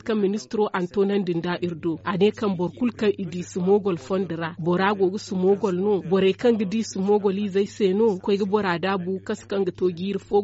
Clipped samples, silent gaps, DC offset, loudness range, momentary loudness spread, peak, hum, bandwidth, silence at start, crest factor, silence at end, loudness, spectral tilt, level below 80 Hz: under 0.1%; none; under 0.1%; 2 LU; 7 LU; -8 dBFS; none; 8 kHz; 0.05 s; 14 dB; 0 s; -24 LUFS; -5.5 dB/octave; -62 dBFS